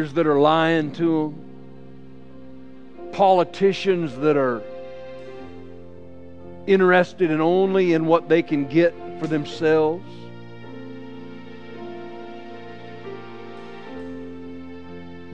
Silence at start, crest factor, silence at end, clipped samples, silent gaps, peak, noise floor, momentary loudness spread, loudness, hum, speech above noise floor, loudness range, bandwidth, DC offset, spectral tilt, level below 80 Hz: 0 s; 20 dB; 0 s; under 0.1%; none; -2 dBFS; -44 dBFS; 23 LU; -20 LUFS; none; 24 dB; 18 LU; 8.4 kHz; 0.9%; -7 dB/octave; -62 dBFS